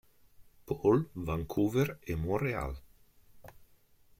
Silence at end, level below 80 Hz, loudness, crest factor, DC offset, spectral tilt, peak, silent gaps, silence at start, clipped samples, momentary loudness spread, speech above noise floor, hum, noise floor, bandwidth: 0.55 s; -50 dBFS; -32 LUFS; 20 dB; under 0.1%; -7.5 dB/octave; -14 dBFS; none; 0.4 s; under 0.1%; 11 LU; 32 dB; none; -63 dBFS; 16.5 kHz